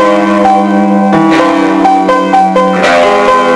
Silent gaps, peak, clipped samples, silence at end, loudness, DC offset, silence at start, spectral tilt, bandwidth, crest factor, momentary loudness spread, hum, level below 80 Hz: none; 0 dBFS; under 0.1%; 0 s; -7 LUFS; under 0.1%; 0 s; -6 dB/octave; 11 kHz; 6 dB; 2 LU; none; -44 dBFS